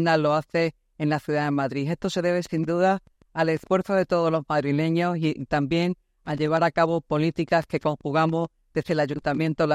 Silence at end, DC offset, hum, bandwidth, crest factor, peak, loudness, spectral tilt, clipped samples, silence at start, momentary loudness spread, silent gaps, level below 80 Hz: 0 s; under 0.1%; none; 12 kHz; 16 dB; -8 dBFS; -25 LUFS; -7 dB/octave; under 0.1%; 0 s; 6 LU; none; -56 dBFS